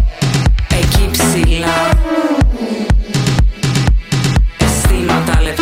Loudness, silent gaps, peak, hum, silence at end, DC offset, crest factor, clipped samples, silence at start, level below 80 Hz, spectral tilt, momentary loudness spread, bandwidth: -14 LUFS; none; 0 dBFS; none; 0 s; under 0.1%; 12 dB; under 0.1%; 0 s; -16 dBFS; -5 dB/octave; 3 LU; 16.5 kHz